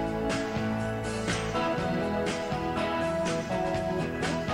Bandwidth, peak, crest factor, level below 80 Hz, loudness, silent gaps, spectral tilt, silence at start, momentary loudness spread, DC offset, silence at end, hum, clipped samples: 16.5 kHz; -18 dBFS; 10 dB; -46 dBFS; -30 LUFS; none; -5.5 dB/octave; 0 s; 2 LU; under 0.1%; 0 s; none; under 0.1%